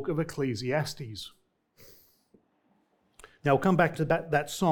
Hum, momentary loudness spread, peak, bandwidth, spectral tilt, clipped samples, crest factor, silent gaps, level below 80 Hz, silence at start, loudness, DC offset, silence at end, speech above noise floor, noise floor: none; 15 LU; -8 dBFS; 19 kHz; -6 dB/octave; under 0.1%; 22 dB; none; -58 dBFS; 0 s; -28 LUFS; under 0.1%; 0 s; 43 dB; -70 dBFS